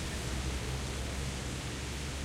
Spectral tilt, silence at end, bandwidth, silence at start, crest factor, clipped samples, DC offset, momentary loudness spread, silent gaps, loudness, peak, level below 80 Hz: -4 dB/octave; 0 s; 16 kHz; 0 s; 12 dB; under 0.1%; under 0.1%; 2 LU; none; -37 LUFS; -24 dBFS; -40 dBFS